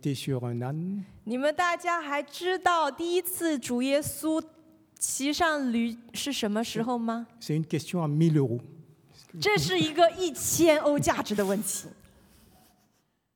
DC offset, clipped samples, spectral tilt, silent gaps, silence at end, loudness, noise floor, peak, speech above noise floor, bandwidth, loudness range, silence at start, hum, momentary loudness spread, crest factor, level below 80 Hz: under 0.1%; under 0.1%; -4.5 dB/octave; none; 1.45 s; -28 LUFS; -72 dBFS; -8 dBFS; 44 dB; over 20 kHz; 4 LU; 0.05 s; none; 9 LU; 20 dB; -62 dBFS